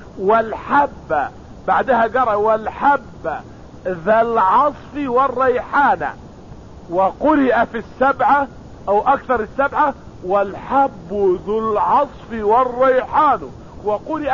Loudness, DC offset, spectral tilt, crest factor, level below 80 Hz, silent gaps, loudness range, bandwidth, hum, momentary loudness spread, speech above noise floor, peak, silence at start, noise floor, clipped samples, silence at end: -17 LUFS; 0.3%; -7 dB/octave; 12 dB; -44 dBFS; none; 1 LU; 7.2 kHz; none; 12 LU; 21 dB; -4 dBFS; 0 s; -37 dBFS; under 0.1%; 0 s